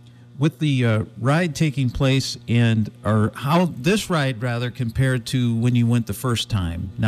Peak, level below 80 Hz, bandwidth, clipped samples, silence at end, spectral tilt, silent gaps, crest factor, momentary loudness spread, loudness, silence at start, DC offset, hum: -8 dBFS; -44 dBFS; 15 kHz; under 0.1%; 0 s; -6 dB/octave; none; 12 dB; 5 LU; -21 LUFS; 0.35 s; under 0.1%; none